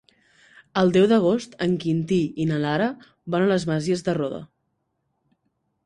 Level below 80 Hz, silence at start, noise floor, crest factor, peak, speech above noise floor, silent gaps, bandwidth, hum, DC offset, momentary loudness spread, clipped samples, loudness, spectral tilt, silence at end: -58 dBFS; 0.75 s; -74 dBFS; 18 dB; -6 dBFS; 53 dB; none; 11 kHz; none; under 0.1%; 10 LU; under 0.1%; -23 LUFS; -6.5 dB/octave; 1.4 s